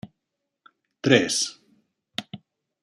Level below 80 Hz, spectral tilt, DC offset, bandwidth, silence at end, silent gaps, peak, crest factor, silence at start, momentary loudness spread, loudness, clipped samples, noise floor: -68 dBFS; -3.5 dB/octave; under 0.1%; 14.5 kHz; 0.45 s; none; -2 dBFS; 26 dB; 0.05 s; 22 LU; -24 LUFS; under 0.1%; -82 dBFS